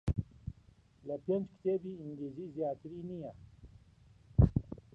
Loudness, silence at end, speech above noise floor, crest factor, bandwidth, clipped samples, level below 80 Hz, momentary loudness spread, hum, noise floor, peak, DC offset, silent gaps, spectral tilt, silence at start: -36 LUFS; 0.2 s; 25 dB; 24 dB; 6.6 kHz; under 0.1%; -44 dBFS; 19 LU; none; -64 dBFS; -12 dBFS; under 0.1%; none; -11 dB/octave; 0.05 s